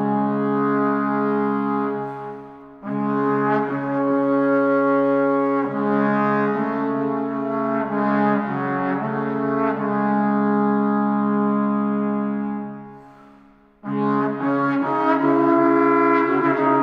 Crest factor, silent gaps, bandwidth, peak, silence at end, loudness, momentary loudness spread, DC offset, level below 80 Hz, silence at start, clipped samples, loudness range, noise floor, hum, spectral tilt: 16 dB; none; 5.2 kHz; -6 dBFS; 0 s; -20 LUFS; 8 LU; under 0.1%; -66 dBFS; 0 s; under 0.1%; 4 LU; -51 dBFS; none; -10 dB/octave